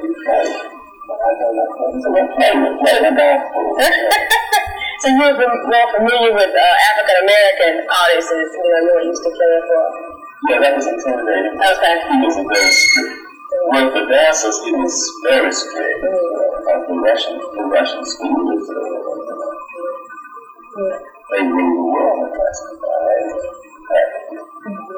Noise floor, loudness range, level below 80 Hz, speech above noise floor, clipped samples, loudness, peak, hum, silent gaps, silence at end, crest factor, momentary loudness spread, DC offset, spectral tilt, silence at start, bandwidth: -37 dBFS; 8 LU; -50 dBFS; 22 dB; under 0.1%; -15 LUFS; 0 dBFS; none; none; 0 s; 16 dB; 15 LU; under 0.1%; -1.5 dB/octave; 0 s; over 20 kHz